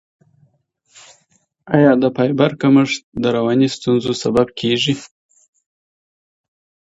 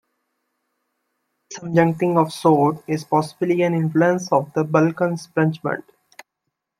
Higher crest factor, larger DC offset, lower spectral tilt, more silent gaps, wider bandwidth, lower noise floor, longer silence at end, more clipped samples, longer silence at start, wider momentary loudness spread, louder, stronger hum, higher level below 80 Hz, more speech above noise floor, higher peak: about the same, 18 dB vs 18 dB; neither; about the same, -6 dB/octave vs -7 dB/octave; first, 3.03-3.12 s vs none; second, 8 kHz vs 13.5 kHz; second, -62 dBFS vs -79 dBFS; first, 1.85 s vs 1 s; neither; first, 1.65 s vs 1.5 s; about the same, 7 LU vs 9 LU; first, -16 LUFS vs -20 LUFS; neither; first, -54 dBFS vs -64 dBFS; second, 46 dB vs 60 dB; about the same, 0 dBFS vs -2 dBFS